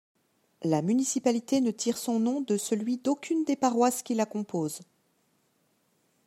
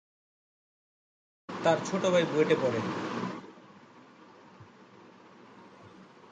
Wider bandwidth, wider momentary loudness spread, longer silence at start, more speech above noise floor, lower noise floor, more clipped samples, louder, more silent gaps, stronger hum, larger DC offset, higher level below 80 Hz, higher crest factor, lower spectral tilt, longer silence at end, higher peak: first, 15.5 kHz vs 9.4 kHz; second, 6 LU vs 16 LU; second, 0.6 s vs 1.5 s; first, 44 dB vs 27 dB; first, -71 dBFS vs -55 dBFS; neither; about the same, -28 LUFS vs -29 LUFS; neither; neither; neither; about the same, -80 dBFS vs -76 dBFS; about the same, 18 dB vs 22 dB; about the same, -5 dB/octave vs -5.5 dB/octave; first, 1.45 s vs 0.3 s; about the same, -10 dBFS vs -12 dBFS